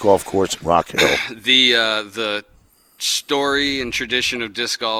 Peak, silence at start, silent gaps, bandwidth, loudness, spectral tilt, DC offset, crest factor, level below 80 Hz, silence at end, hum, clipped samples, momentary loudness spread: 0 dBFS; 0 s; none; 19 kHz; -18 LUFS; -2 dB/octave; under 0.1%; 20 dB; -48 dBFS; 0 s; none; under 0.1%; 10 LU